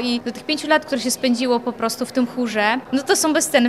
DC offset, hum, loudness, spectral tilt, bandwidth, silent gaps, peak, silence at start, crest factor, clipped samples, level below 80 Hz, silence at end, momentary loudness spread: 0.1%; none; -20 LUFS; -2.5 dB/octave; 15 kHz; none; -4 dBFS; 0 s; 16 dB; under 0.1%; -62 dBFS; 0 s; 7 LU